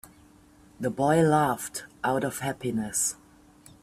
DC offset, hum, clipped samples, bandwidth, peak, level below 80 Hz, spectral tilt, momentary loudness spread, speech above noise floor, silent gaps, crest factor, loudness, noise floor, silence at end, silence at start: under 0.1%; none; under 0.1%; 16 kHz; -10 dBFS; -60 dBFS; -4.5 dB/octave; 12 LU; 30 dB; none; 18 dB; -27 LUFS; -56 dBFS; 0.7 s; 0.05 s